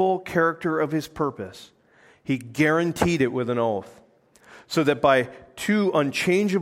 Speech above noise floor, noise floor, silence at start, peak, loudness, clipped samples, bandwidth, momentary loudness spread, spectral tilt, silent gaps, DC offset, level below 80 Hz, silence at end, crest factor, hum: 33 dB; -56 dBFS; 0 s; -4 dBFS; -23 LUFS; under 0.1%; 16.5 kHz; 10 LU; -5.5 dB/octave; none; under 0.1%; -56 dBFS; 0 s; 20 dB; none